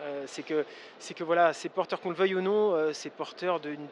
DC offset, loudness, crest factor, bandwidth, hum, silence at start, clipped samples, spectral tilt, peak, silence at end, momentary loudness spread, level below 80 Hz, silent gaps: under 0.1%; -30 LUFS; 18 dB; 10.5 kHz; none; 0 s; under 0.1%; -4.5 dB/octave; -12 dBFS; 0 s; 13 LU; under -90 dBFS; none